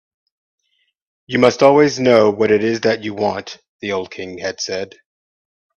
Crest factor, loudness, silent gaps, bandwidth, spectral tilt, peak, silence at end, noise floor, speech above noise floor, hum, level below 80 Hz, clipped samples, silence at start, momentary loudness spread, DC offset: 18 dB; -16 LUFS; 3.68-3.79 s; 8.4 kHz; -5 dB/octave; 0 dBFS; 0.9 s; -67 dBFS; 52 dB; none; -58 dBFS; under 0.1%; 1.3 s; 16 LU; under 0.1%